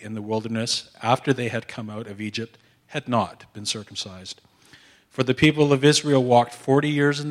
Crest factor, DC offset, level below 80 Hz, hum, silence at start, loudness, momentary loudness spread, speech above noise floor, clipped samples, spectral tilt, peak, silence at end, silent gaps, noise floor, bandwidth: 20 dB; under 0.1%; -58 dBFS; none; 0 s; -22 LUFS; 16 LU; 30 dB; under 0.1%; -5 dB/octave; -4 dBFS; 0 s; none; -53 dBFS; 14.5 kHz